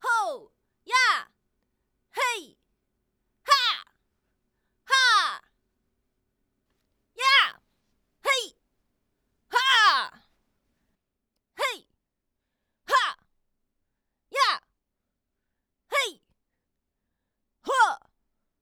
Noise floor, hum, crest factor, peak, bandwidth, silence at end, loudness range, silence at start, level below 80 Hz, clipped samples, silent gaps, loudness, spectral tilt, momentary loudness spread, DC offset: -82 dBFS; none; 24 dB; -6 dBFS; over 20 kHz; 0.65 s; 7 LU; 0.05 s; -78 dBFS; under 0.1%; none; -24 LUFS; 2.5 dB/octave; 18 LU; under 0.1%